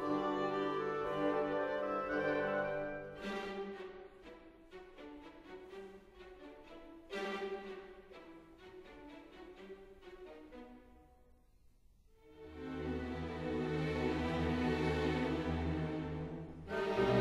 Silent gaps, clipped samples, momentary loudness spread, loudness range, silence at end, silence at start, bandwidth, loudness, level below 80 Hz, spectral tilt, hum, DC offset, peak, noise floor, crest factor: none; under 0.1%; 20 LU; 18 LU; 0 s; 0 s; 13.5 kHz; -38 LUFS; -56 dBFS; -7 dB/octave; none; under 0.1%; -20 dBFS; -66 dBFS; 20 dB